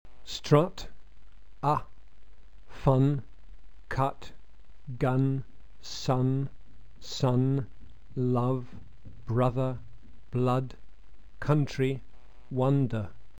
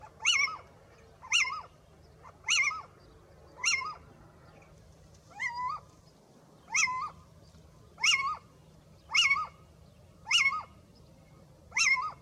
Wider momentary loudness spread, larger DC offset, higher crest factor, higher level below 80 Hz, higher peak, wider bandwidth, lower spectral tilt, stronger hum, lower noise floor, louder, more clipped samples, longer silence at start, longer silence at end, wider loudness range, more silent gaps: about the same, 19 LU vs 17 LU; first, 1% vs under 0.1%; about the same, 22 dB vs 20 dB; first, -50 dBFS vs -64 dBFS; first, -8 dBFS vs -14 dBFS; second, 8.4 kHz vs 15.5 kHz; first, -7.5 dB/octave vs 1.5 dB/octave; neither; second, -54 dBFS vs -59 dBFS; about the same, -29 LUFS vs -28 LUFS; neither; first, 0.2 s vs 0 s; about the same, 0 s vs 0.05 s; second, 2 LU vs 7 LU; neither